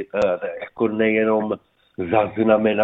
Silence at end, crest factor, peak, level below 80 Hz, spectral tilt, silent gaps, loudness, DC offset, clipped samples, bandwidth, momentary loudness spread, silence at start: 0 s; 16 dB; -4 dBFS; -56 dBFS; -7.5 dB/octave; none; -21 LUFS; under 0.1%; under 0.1%; 7.6 kHz; 13 LU; 0 s